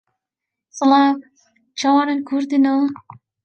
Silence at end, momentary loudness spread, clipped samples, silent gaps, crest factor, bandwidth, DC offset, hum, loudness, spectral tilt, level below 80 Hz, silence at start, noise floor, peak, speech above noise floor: 0.5 s; 18 LU; under 0.1%; none; 16 dB; 8.4 kHz; under 0.1%; none; -18 LUFS; -3.5 dB/octave; -72 dBFS; 0.75 s; -84 dBFS; -4 dBFS; 67 dB